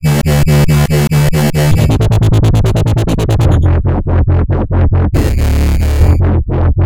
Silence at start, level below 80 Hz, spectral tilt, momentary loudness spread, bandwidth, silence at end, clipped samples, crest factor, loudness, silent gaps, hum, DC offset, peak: 0 s; -16 dBFS; -7 dB/octave; 3 LU; 17 kHz; 0 s; under 0.1%; 10 dB; -11 LUFS; none; none; under 0.1%; 0 dBFS